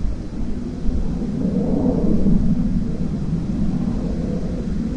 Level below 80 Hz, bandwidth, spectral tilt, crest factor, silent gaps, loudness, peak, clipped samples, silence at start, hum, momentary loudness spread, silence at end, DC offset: -26 dBFS; 8.2 kHz; -9.5 dB/octave; 14 dB; none; -22 LUFS; -6 dBFS; under 0.1%; 0 s; none; 9 LU; 0 s; under 0.1%